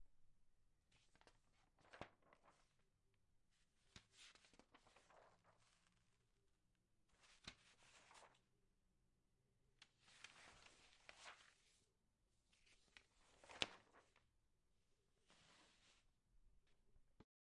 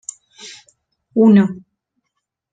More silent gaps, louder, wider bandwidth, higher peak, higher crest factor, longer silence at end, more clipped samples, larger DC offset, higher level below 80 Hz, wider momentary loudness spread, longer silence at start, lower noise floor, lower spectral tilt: neither; second, -58 LUFS vs -14 LUFS; first, 10.5 kHz vs 9.2 kHz; second, -18 dBFS vs -2 dBFS; first, 48 dB vs 16 dB; second, 0.25 s vs 0.95 s; neither; neither; second, -84 dBFS vs -62 dBFS; second, 20 LU vs 25 LU; second, 0 s vs 0.45 s; first, -86 dBFS vs -76 dBFS; second, -1.5 dB/octave vs -7 dB/octave